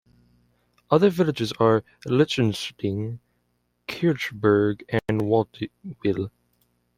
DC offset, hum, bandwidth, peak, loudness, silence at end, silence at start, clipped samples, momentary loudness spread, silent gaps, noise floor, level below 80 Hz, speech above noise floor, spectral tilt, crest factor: under 0.1%; 60 Hz at -50 dBFS; 15.5 kHz; -4 dBFS; -23 LUFS; 0.7 s; 0.9 s; under 0.1%; 14 LU; none; -71 dBFS; -58 dBFS; 49 dB; -6.5 dB/octave; 20 dB